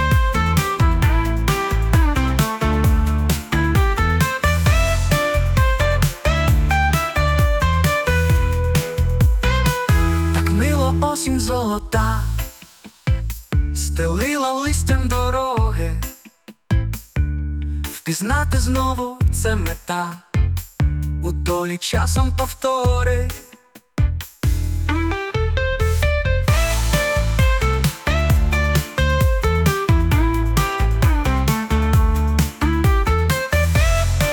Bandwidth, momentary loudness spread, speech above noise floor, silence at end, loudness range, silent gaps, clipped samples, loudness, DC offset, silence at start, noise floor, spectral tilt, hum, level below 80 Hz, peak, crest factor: 19.5 kHz; 6 LU; 28 dB; 0 s; 4 LU; none; under 0.1%; -19 LUFS; under 0.1%; 0 s; -47 dBFS; -5.5 dB/octave; none; -22 dBFS; -4 dBFS; 14 dB